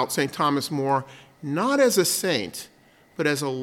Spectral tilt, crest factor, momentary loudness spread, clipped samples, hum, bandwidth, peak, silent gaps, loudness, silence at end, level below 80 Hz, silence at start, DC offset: -3.5 dB/octave; 18 dB; 19 LU; under 0.1%; none; 17.5 kHz; -6 dBFS; none; -23 LUFS; 0 s; -70 dBFS; 0 s; under 0.1%